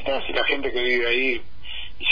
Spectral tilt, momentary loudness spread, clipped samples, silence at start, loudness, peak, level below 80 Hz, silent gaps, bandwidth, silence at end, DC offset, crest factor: -5 dB/octave; 14 LU; under 0.1%; 0 s; -22 LUFS; -6 dBFS; -44 dBFS; none; 5.2 kHz; 0 s; 4%; 18 dB